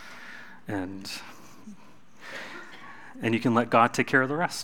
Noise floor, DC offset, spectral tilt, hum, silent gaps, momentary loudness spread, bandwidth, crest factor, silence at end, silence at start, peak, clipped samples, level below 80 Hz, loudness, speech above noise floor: -54 dBFS; 0.5%; -5 dB/octave; none; none; 25 LU; 17.5 kHz; 24 dB; 0 s; 0 s; -6 dBFS; under 0.1%; -72 dBFS; -26 LUFS; 29 dB